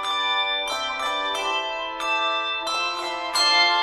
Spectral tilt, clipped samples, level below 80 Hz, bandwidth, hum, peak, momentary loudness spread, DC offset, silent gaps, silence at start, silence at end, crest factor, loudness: 1 dB/octave; under 0.1%; -58 dBFS; 13.5 kHz; none; -6 dBFS; 8 LU; under 0.1%; none; 0 s; 0 s; 18 dB; -22 LUFS